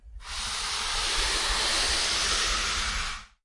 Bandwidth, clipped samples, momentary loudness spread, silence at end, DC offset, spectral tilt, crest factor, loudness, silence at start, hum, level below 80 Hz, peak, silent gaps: 11.5 kHz; under 0.1%; 8 LU; 0.2 s; under 0.1%; 0 dB/octave; 14 dB; -26 LUFS; 0.05 s; none; -38 dBFS; -14 dBFS; none